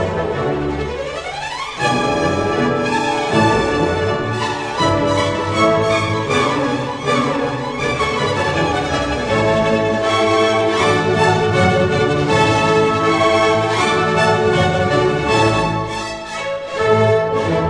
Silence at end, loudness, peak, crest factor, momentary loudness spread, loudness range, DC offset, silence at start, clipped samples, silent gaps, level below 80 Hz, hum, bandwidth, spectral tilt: 0 s; -16 LUFS; -2 dBFS; 14 dB; 7 LU; 3 LU; under 0.1%; 0 s; under 0.1%; none; -38 dBFS; none; 11 kHz; -5 dB/octave